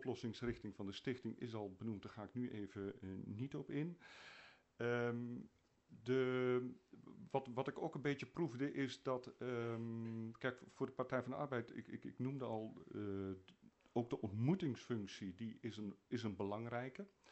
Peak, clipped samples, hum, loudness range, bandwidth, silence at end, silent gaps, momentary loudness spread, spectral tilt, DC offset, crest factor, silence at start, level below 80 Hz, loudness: -26 dBFS; under 0.1%; none; 5 LU; 8.2 kHz; 0 s; none; 11 LU; -7 dB/octave; under 0.1%; 20 dB; 0 s; -76 dBFS; -45 LUFS